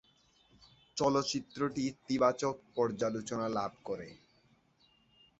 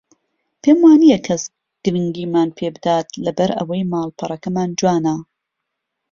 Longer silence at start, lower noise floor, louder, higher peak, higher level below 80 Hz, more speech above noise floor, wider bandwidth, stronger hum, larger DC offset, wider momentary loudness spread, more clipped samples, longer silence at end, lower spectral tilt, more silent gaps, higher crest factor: first, 0.95 s vs 0.65 s; second, -69 dBFS vs -78 dBFS; second, -34 LUFS vs -17 LUFS; second, -14 dBFS vs -2 dBFS; second, -70 dBFS vs -56 dBFS; second, 36 dB vs 62 dB; first, 8.2 kHz vs 7.4 kHz; neither; neither; about the same, 12 LU vs 13 LU; neither; first, 1.25 s vs 0.9 s; about the same, -5 dB/octave vs -6 dB/octave; neither; first, 22 dB vs 16 dB